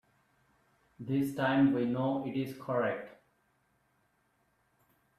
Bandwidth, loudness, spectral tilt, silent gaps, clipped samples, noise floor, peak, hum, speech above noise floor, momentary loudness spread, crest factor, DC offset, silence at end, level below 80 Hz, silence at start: 14 kHz; -32 LUFS; -7.5 dB/octave; none; under 0.1%; -74 dBFS; -16 dBFS; none; 43 dB; 13 LU; 18 dB; under 0.1%; 2.1 s; -72 dBFS; 1 s